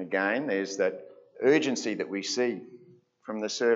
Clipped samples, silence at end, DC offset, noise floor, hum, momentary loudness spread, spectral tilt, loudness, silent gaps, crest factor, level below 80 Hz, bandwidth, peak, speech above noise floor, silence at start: under 0.1%; 0 s; under 0.1%; -57 dBFS; none; 15 LU; -3.5 dB/octave; -28 LUFS; none; 18 dB; -86 dBFS; 8 kHz; -12 dBFS; 30 dB; 0 s